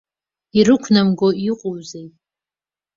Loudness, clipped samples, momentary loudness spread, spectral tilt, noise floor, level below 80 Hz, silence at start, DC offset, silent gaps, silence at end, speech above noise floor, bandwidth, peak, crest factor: -17 LUFS; under 0.1%; 18 LU; -6 dB/octave; under -90 dBFS; -56 dBFS; 0.55 s; under 0.1%; none; 0.9 s; over 74 dB; 7.6 kHz; -2 dBFS; 18 dB